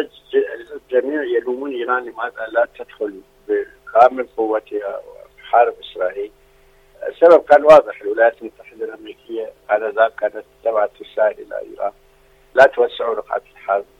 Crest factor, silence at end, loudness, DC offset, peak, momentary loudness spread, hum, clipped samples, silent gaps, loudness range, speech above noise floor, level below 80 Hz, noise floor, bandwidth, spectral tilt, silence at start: 18 dB; 0.15 s; -17 LUFS; under 0.1%; 0 dBFS; 19 LU; none; under 0.1%; none; 7 LU; 35 dB; -56 dBFS; -52 dBFS; 8.4 kHz; -5 dB/octave; 0 s